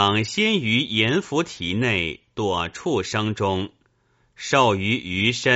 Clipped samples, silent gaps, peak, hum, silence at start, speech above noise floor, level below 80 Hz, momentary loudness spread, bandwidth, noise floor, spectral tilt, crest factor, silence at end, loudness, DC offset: under 0.1%; none; -4 dBFS; none; 0 s; 42 dB; -52 dBFS; 7 LU; 8 kHz; -64 dBFS; -3 dB/octave; 20 dB; 0 s; -22 LUFS; under 0.1%